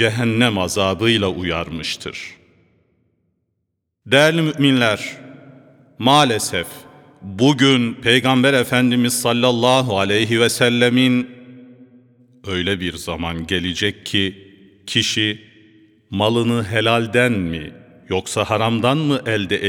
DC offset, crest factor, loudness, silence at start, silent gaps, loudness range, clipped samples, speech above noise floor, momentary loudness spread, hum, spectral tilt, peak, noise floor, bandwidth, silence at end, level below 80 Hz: under 0.1%; 18 dB; -17 LUFS; 0 s; none; 7 LU; under 0.1%; 57 dB; 12 LU; none; -4.5 dB/octave; 0 dBFS; -74 dBFS; 18.5 kHz; 0 s; -50 dBFS